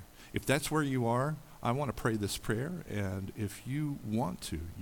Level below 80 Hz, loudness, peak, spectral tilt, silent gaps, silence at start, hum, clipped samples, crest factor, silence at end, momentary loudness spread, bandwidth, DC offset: -52 dBFS; -35 LUFS; -14 dBFS; -5.5 dB/octave; none; 0 s; none; under 0.1%; 20 dB; 0 s; 8 LU; 19 kHz; under 0.1%